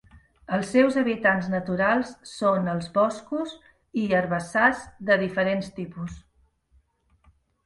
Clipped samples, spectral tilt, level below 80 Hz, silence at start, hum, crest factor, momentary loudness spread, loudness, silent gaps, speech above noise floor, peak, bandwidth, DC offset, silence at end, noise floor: under 0.1%; -6 dB/octave; -56 dBFS; 0.15 s; none; 20 dB; 14 LU; -24 LUFS; none; 40 dB; -6 dBFS; 11.5 kHz; under 0.1%; 1.45 s; -64 dBFS